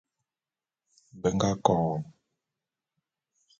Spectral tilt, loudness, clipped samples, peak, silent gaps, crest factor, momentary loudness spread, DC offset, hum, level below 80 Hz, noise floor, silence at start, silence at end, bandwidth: -6 dB/octave; -28 LUFS; under 0.1%; -4 dBFS; none; 28 dB; 11 LU; under 0.1%; none; -58 dBFS; under -90 dBFS; 1.15 s; 1.5 s; 7.6 kHz